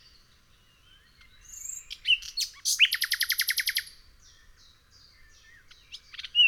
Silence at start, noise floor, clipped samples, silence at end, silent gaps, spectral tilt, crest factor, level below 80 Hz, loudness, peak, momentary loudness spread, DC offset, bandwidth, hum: 1.5 s; -61 dBFS; under 0.1%; 0 s; none; 4.5 dB/octave; 22 dB; -62 dBFS; -26 LUFS; -10 dBFS; 24 LU; under 0.1%; 19 kHz; none